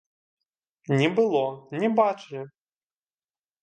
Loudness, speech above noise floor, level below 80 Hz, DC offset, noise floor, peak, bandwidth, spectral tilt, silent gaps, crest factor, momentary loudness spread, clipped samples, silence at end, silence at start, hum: -24 LUFS; over 66 dB; -76 dBFS; under 0.1%; under -90 dBFS; -6 dBFS; 9 kHz; -7 dB/octave; none; 20 dB; 17 LU; under 0.1%; 1.15 s; 0.9 s; none